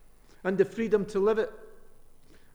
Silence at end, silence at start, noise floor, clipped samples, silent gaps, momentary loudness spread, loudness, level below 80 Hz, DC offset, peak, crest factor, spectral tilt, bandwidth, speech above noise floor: 0.55 s; 0.45 s; -51 dBFS; under 0.1%; none; 9 LU; -28 LUFS; -54 dBFS; under 0.1%; -12 dBFS; 18 dB; -7 dB/octave; 11 kHz; 25 dB